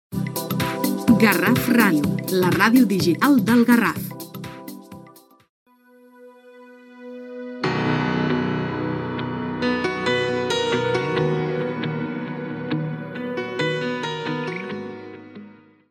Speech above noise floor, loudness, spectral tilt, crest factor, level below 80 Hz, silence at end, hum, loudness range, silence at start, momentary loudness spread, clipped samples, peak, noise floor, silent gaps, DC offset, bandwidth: 34 dB; -21 LUFS; -5.5 dB/octave; 22 dB; -56 dBFS; 0.4 s; none; 12 LU; 0.1 s; 19 LU; under 0.1%; 0 dBFS; -52 dBFS; 5.49-5.66 s; under 0.1%; 17.5 kHz